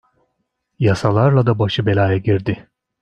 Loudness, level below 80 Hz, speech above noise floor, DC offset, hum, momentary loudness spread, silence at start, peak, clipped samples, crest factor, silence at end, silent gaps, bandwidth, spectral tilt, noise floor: -17 LUFS; -50 dBFS; 57 dB; under 0.1%; none; 6 LU; 0.8 s; -2 dBFS; under 0.1%; 16 dB; 0.4 s; none; 9 kHz; -7.5 dB/octave; -72 dBFS